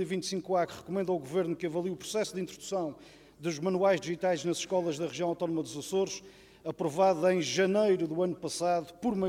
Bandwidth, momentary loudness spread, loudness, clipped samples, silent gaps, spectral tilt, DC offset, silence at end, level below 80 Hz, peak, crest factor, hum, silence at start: 15.5 kHz; 8 LU; -31 LUFS; under 0.1%; none; -5 dB/octave; under 0.1%; 0 s; -68 dBFS; -14 dBFS; 18 dB; none; 0 s